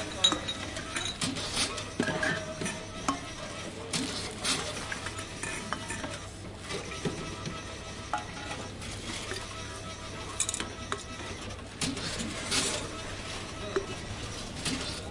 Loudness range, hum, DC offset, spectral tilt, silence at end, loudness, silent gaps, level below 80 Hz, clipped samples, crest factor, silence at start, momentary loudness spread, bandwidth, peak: 5 LU; none; under 0.1%; -2.5 dB/octave; 0 s; -34 LUFS; none; -50 dBFS; under 0.1%; 24 dB; 0 s; 9 LU; 11.5 kHz; -10 dBFS